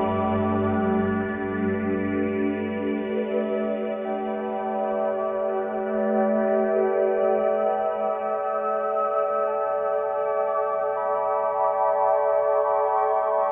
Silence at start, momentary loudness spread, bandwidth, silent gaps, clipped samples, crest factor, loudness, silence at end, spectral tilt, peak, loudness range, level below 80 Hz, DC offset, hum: 0 s; 5 LU; 3.7 kHz; none; under 0.1%; 14 dB; -24 LUFS; 0 s; -10.5 dB/octave; -10 dBFS; 3 LU; -60 dBFS; under 0.1%; none